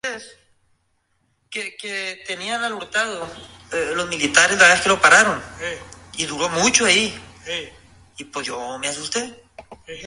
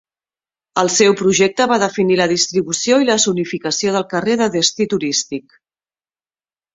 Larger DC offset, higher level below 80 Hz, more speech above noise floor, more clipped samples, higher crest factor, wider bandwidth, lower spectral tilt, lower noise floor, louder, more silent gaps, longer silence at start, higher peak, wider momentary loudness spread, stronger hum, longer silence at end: neither; about the same, -54 dBFS vs -58 dBFS; second, 47 dB vs over 74 dB; neither; first, 22 dB vs 16 dB; first, 11.5 kHz vs 8 kHz; second, -1 dB/octave vs -3 dB/octave; second, -67 dBFS vs under -90 dBFS; second, -19 LUFS vs -15 LUFS; neither; second, 0.05 s vs 0.75 s; about the same, 0 dBFS vs 0 dBFS; first, 22 LU vs 7 LU; neither; second, 0 s vs 1.35 s